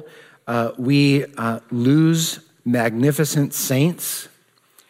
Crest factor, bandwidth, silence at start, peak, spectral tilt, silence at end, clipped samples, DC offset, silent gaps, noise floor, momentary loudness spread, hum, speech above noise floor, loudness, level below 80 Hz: 16 dB; 16 kHz; 0 s; -4 dBFS; -5.5 dB/octave; 0.6 s; under 0.1%; under 0.1%; none; -56 dBFS; 10 LU; none; 37 dB; -19 LUFS; -70 dBFS